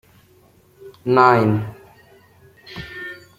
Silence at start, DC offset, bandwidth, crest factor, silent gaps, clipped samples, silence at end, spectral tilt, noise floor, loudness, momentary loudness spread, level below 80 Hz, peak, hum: 0.85 s; under 0.1%; 15.5 kHz; 20 dB; none; under 0.1%; 0.2 s; -8 dB/octave; -53 dBFS; -16 LUFS; 21 LU; -56 dBFS; 0 dBFS; none